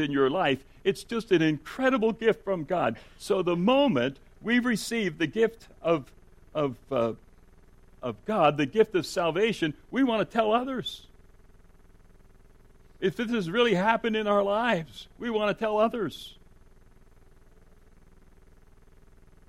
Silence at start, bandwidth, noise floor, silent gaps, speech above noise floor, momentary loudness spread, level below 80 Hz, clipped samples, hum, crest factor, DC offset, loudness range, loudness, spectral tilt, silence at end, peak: 0 s; 15.5 kHz; -54 dBFS; none; 28 dB; 11 LU; -56 dBFS; under 0.1%; none; 20 dB; under 0.1%; 6 LU; -27 LUFS; -5.5 dB/octave; 3.15 s; -8 dBFS